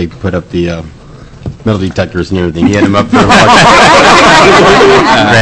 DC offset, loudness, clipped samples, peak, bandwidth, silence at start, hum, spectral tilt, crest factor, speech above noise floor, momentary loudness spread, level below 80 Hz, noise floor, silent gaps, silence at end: under 0.1%; -5 LUFS; 3%; 0 dBFS; 11 kHz; 0 s; none; -4.5 dB/octave; 6 dB; 22 dB; 14 LU; -30 dBFS; -28 dBFS; none; 0 s